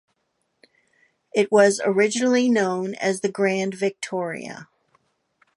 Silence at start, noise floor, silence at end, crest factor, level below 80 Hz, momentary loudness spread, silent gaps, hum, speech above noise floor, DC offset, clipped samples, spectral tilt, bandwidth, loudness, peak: 1.35 s; -73 dBFS; 0.95 s; 20 dB; -74 dBFS; 12 LU; none; none; 52 dB; under 0.1%; under 0.1%; -4.5 dB/octave; 11.5 kHz; -21 LUFS; -4 dBFS